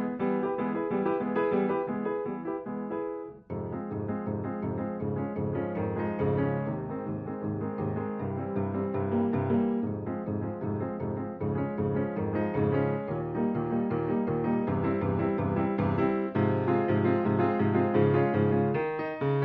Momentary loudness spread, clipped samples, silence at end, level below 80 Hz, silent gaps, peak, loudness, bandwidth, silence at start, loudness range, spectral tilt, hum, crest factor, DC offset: 8 LU; under 0.1%; 0 s; -58 dBFS; none; -10 dBFS; -30 LUFS; 4.8 kHz; 0 s; 6 LU; -8.5 dB/octave; none; 18 dB; under 0.1%